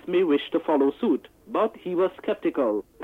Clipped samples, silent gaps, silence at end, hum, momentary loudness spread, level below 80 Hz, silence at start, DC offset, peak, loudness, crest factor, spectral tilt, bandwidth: under 0.1%; none; 0 s; none; 5 LU; -64 dBFS; 0.05 s; under 0.1%; -12 dBFS; -25 LUFS; 12 dB; -7.5 dB/octave; 4.2 kHz